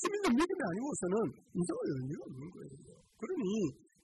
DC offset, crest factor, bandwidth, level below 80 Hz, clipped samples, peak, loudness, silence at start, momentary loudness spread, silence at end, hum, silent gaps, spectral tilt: under 0.1%; 14 dB; 12 kHz; -66 dBFS; under 0.1%; -22 dBFS; -36 LUFS; 0 s; 17 LU; 0.3 s; none; none; -5.5 dB/octave